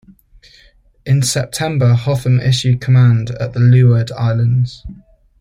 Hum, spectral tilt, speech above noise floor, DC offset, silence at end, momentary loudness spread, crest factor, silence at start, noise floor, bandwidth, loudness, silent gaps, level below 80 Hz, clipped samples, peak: none; -6 dB/octave; 36 dB; under 0.1%; 0.45 s; 8 LU; 12 dB; 1.05 s; -49 dBFS; 15 kHz; -14 LUFS; none; -42 dBFS; under 0.1%; -2 dBFS